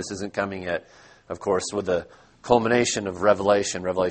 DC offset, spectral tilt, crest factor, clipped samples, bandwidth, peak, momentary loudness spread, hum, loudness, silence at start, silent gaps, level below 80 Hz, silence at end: under 0.1%; -4 dB/octave; 22 dB; under 0.1%; 8.8 kHz; -2 dBFS; 11 LU; none; -24 LUFS; 0 s; none; -56 dBFS; 0 s